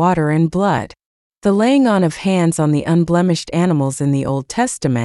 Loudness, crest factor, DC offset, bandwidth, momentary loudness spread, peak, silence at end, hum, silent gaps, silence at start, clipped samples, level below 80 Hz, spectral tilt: -16 LUFS; 12 dB; under 0.1%; 12 kHz; 6 LU; -4 dBFS; 0 s; none; 1.05-1.30 s; 0 s; under 0.1%; -48 dBFS; -6.5 dB/octave